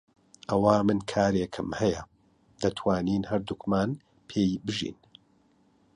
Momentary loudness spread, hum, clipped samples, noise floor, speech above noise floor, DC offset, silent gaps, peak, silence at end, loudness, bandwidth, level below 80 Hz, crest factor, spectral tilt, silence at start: 11 LU; none; under 0.1%; -65 dBFS; 38 dB; under 0.1%; none; -8 dBFS; 1 s; -28 LUFS; 10.5 kHz; -54 dBFS; 22 dB; -6.5 dB/octave; 0.5 s